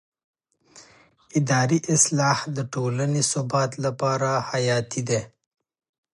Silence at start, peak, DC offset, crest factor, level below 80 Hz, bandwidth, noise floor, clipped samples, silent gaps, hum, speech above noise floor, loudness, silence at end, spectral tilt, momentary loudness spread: 0.75 s; -4 dBFS; under 0.1%; 22 dB; -64 dBFS; 11.5 kHz; -55 dBFS; under 0.1%; none; none; 32 dB; -23 LUFS; 0.85 s; -4.5 dB/octave; 8 LU